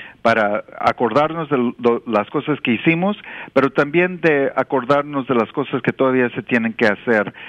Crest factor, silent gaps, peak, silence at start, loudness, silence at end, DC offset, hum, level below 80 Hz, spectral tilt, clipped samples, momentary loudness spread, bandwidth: 16 dB; none; -2 dBFS; 0 s; -18 LUFS; 0 s; under 0.1%; none; -58 dBFS; -7.5 dB/octave; under 0.1%; 4 LU; 9.2 kHz